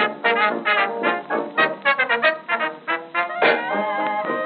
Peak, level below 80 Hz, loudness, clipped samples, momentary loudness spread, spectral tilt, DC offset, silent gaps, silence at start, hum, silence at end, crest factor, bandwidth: -4 dBFS; under -90 dBFS; -20 LUFS; under 0.1%; 6 LU; 0 dB/octave; under 0.1%; none; 0 s; none; 0 s; 18 dB; 4.9 kHz